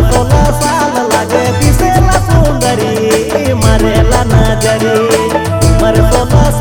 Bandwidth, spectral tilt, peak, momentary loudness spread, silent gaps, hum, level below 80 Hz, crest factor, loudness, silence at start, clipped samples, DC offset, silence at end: 19 kHz; -5.5 dB/octave; 0 dBFS; 3 LU; none; none; -16 dBFS; 8 dB; -10 LUFS; 0 s; 0.7%; under 0.1%; 0 s